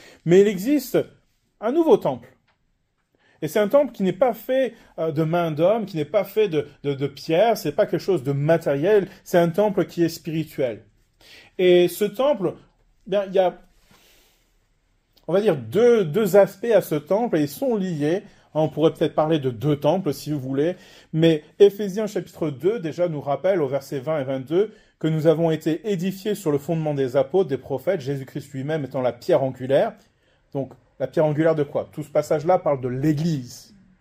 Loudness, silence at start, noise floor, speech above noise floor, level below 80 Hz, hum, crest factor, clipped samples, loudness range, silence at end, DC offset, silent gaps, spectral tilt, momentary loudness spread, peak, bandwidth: -22 LUFS; 0.25 s; -69 dBFS; 48 dB; -62 dBFS; none; 20 dB; under 0.1%; 4 LU; 0.4 s; under 0.1%; none; -7 dB/octave; 11 LU; -2 dBFS; 16 kHz